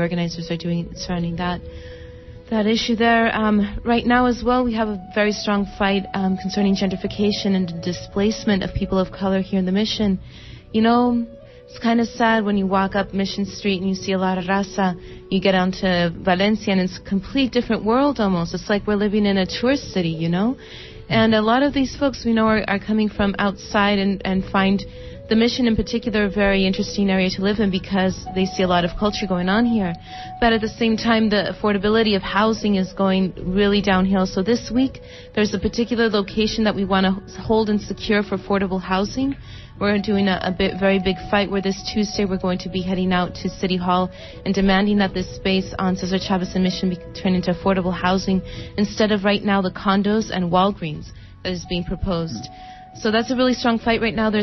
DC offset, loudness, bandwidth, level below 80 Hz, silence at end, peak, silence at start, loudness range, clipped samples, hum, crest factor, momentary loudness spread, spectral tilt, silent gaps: under 0.1%; -20 LUFS; 6.2 kHz; -40 dBFS; 0 s; -4 dBFS; 0 s; 3 LU; under 0.1%; none; 16 dB; 8 LU; -6 dB/octave; none